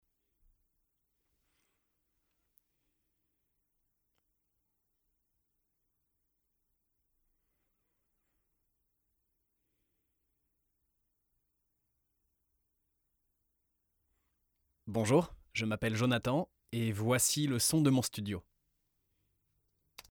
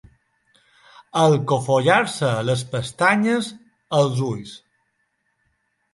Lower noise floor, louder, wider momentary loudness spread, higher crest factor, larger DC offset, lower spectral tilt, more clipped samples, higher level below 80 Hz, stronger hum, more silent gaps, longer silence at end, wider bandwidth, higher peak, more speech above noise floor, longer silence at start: first, -82 dBFS vs -71 dBFS; second, -32 LUFS vs -20 LUFS; about the same, 11 LU vs 11 LU; about the same, 24 dB vs 22 dB; neither; about the same, -4.5 dB/octave vs -5.5 dB/octave; neither; second, -68 dBFS vs -60 dBFS; first, 50 Hz at -85 dBFS vs none; neither; first, 1.7 s vs 1.35 s; first, over 20 kHz vs 11.5 kHz; second, -16 dBFS vs 0 dBFS; about the same, 51 dB vs 51 dB; first, 14.85 s vs 1.15 s